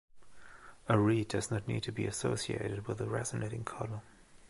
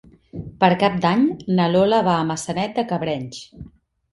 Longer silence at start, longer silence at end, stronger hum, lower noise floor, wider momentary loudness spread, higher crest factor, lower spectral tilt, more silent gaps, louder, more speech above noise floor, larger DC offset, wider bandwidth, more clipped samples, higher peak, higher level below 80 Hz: second, 0.1 s vs 0.35 s; second, 0 s vs 0.45 s; neither; first, -55 dBFS vs -47 dBFS; second, 14 LU vs 19 LU; about the same, 22 dB vs 18 dB; about the same, -5.5 dB/octave vs -6 dB/octave; neither; second, -35 LUFS vs -20 LUFS; second, 21 dB vs 28 dB; neither; about the same, 11.5 kHz vs 11.5 kHz; neither; second, -12 dBFS vs -2 dBFS; second, -60 dBFS vs -52 dBFS